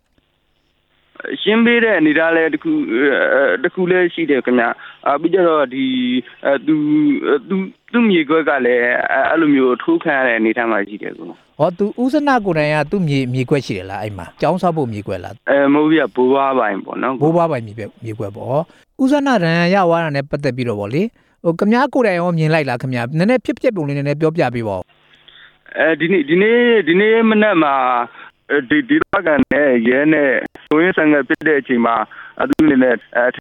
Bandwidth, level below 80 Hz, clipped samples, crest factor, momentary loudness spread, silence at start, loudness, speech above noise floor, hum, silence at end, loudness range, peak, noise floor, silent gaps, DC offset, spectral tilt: 11 kHz; -54 dBFS; under 0.1%; 16 dB; 10 LU; 1.25 s; -15 LUFS; 47 dB; none; 0 s; 4 LU; 0 dBFS; -62 dBFS; none; under 0.1%; -7 dB/octave